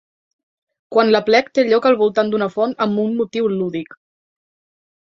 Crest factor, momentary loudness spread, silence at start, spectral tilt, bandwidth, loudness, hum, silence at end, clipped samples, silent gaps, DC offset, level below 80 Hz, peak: 16 dB; 8 LU; 0.9 s; -6 dB/octave; 7.2 kHz; -17 LUFS; none; 1.25 s; under 0.1%; none; under 0.1%; -64 dBFS; -2 dBFS